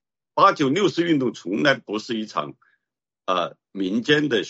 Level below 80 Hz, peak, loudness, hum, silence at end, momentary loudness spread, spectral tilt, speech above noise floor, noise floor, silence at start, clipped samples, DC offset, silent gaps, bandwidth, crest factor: -68 dBFS; -2 dBFS; -22 LUFS; none; 0 s; 12 LU; -5 dB/octave; 64 dB; -86 dBFS; 0.35 s; under 0.1%; under 0.1%; none; 8 kHz; 20 dB